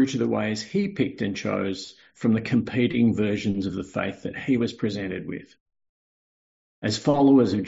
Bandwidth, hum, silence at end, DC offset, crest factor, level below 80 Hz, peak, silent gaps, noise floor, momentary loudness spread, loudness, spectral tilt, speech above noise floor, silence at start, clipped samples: 8 kHz; none; 0 s; under 0.1%; 16 dB; -58 dBFS; -8 dBFS; 5.60-5.66 s, 5.89-6.82 s; under -90 dBFS; 11 LU; -25 LUFS; -6 dB/octave; over 66 dB; 0 s; under 0.1%